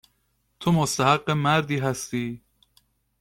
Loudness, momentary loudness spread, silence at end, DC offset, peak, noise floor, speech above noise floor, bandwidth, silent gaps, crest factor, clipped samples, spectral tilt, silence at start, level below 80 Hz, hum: -24 LUFS; 10 LU; 0.85 s; under 0.1%; -6 dBFS; -70 dBFS; 47 dB; 16.5 kHz; none; 20 dB; under 0.1%; -5 dB/octave; 0.6 s; -58 dBFS; none